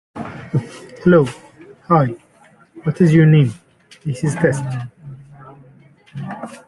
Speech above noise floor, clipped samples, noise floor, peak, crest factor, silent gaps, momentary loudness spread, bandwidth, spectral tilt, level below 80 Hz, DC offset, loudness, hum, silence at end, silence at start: 35 dB; under 0.1%; -50 dBFS; 0 dBFS; 18 dB; none; 23 LU; 11.5 kHz; -8 dB/octave; -52 dBFS; under 0.1%; -17 LUFS; none; 0.1 s; 0.15 s